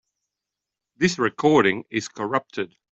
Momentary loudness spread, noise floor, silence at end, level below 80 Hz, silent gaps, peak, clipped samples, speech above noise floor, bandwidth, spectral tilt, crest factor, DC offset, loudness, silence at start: 12 LU; -86 dBFS; 0.3 s; -60 dBFS; none; -4 dBFS; under 0.1%; 64 dB; 8.2 kHz; -5 dB/octave; 20 dB; under 0.1%; -22 LUFS; 1 s